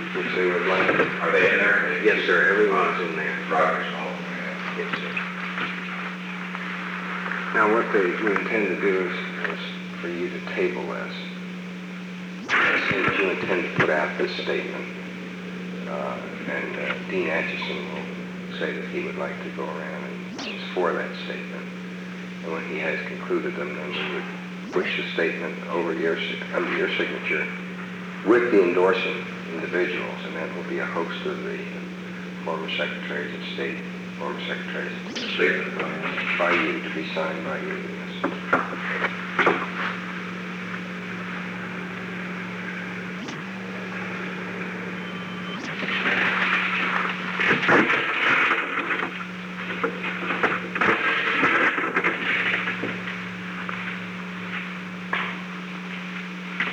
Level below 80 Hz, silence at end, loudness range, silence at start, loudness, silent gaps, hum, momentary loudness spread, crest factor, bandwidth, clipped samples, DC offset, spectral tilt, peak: -66 dBFS; 0 s; 9 LU; 0 s; -25 LUFS; none; none; 13 LU; 20 dB; 10.5 kHz; under 0.1%; under 0.1%; -5.5 dB/octave; -4 dBFS